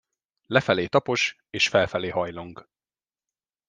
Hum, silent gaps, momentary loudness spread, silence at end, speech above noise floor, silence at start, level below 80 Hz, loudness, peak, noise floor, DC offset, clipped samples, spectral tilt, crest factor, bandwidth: none; none; 11 LU; 1.05 s; over 66 dB; 0.5 s; -62 dBFS; -24 LUFS; -4 dBFS; under -90 dBFS; under 0.1%; under 0.1%; -4 dB/octave; 24 dB; 10 kHz